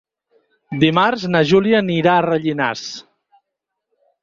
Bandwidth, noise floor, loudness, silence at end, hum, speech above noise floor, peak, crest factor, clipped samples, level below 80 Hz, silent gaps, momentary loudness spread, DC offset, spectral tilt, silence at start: 7.6 kHz; -80 dBFS; -16 LUFS; 1.2 s; none; 64 dB; -2 dBFS; 16 dB; under 0.1%; -56 dBFS; none; 15 LU; under 0.1%; -6 dB/octave; 0.7 s